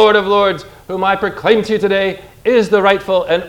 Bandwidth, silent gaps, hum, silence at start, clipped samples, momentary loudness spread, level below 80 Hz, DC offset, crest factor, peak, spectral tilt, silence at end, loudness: 15.5 kHz; none; none; 0 s; under 0.1%; 9 LU; -46 dBFS; under 0.1%; 14 dB; 0 dBFS; -5.5 dB/octave; 0 s; -14 LUFS